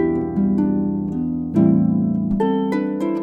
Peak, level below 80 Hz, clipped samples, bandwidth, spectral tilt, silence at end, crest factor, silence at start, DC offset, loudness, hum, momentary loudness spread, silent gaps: -4 dBFS; -42 dBFS; under 0.1%; 5 kHz; -10 dB/octave; 0 s; 14 dB; 0 s; under 0.1%; -19 LUFS; none; 7 LU; none